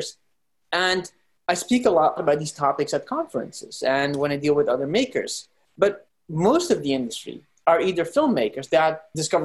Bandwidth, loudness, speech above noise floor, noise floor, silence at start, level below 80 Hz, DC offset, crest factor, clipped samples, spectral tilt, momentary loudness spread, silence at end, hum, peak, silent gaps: 12.5 kHz; -23 LUFS; 54 dB; -76 dBFS; 0 s; -62 dBFS; under 0.1%; 18 dB; under 0.1%; -4.5 dB/octave; 11 LU; 0 s; none; -4 dBFS; none